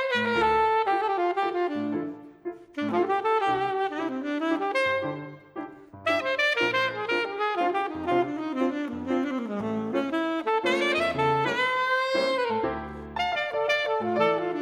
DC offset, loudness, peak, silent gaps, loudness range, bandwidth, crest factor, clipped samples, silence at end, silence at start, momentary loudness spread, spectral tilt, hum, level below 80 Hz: under 0.1%; -26 LUFS; -10 dBFS; none; 2 LU; 13.5 kHz; 16 dB; under 0.1%; 0 s; 0 s; 10 LU; -5 dB/octave; none; -58 dBFS